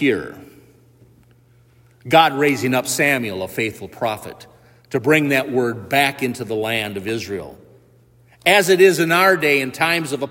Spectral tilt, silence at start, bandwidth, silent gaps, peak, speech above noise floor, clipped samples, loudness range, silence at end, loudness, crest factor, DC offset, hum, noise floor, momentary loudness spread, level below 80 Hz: -4 dB/octave; 0 s; 16.5 kHz; none; 0 dBFS; 35 dB; under 0.1%; 4 LU; 0 s; -17 LUFS; 18 dB; under 0.1%; none; -53 dBFS; 12 LU; -60 dBFS